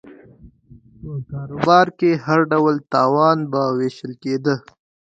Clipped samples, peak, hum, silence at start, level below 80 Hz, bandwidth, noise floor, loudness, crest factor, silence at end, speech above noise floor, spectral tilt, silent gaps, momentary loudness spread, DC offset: under 0.1%; 0 dBFS; none; 0.05 s; -54 dBFS; 7.8 kHz; -48 dBFS; -18 LUFS; 18 dB; 0.55 s; 30 dB; -7 dB/octave; none; 15 LU; under 0.1%